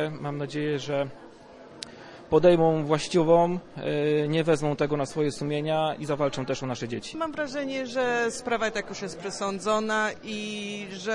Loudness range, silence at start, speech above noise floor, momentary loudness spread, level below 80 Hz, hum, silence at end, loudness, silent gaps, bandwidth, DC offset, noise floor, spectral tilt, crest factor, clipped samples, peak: 5 LU; 0 s; 22 dB; 12 LU; -58 dBFS; none; 0 s; -27 LUFS; none; 11.5 kHz; under 0.1%; -48 dBFS; -5.5 dB/octave; 20 dB; under 0.1%; -8 dBFS